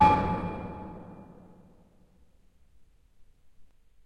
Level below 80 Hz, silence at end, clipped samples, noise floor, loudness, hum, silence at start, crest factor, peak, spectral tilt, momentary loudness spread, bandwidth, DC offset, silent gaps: -48 dBFS; 0.4 s; under 0.1%; -60 dBFS; -30 LUFS; none; 0 s; 24 dB; -8 dBFS; -7.5 dB/octave; 26 LU; 9.2 kHz; under 0.1%; none